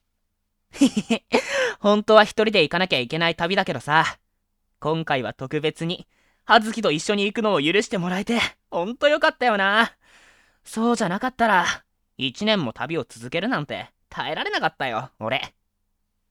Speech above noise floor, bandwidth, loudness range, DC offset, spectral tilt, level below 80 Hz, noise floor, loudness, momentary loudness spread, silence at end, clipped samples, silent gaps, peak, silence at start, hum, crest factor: 52 dB; 14.5 kHz; 6 LU; under 0.1%; -4.5 dB/octave; -58 dBFS; -74 dBFS; -22 LUFS; 11 LU; 0.85 s; under 0.1%; none; 0 dBFS; 0.75 s; none; 22 dB